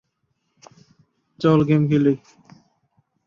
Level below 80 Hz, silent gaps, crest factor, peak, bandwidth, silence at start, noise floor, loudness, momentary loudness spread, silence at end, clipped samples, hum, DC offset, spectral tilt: -58 dBFS; none; 18 dB; -4 dBFS; 7 kHz; 1.4 s; -72 dBFS; -19 LUFS; 6 LU; 1.1 s; under 0.1%; none; under 0.1%; -9 dB/octave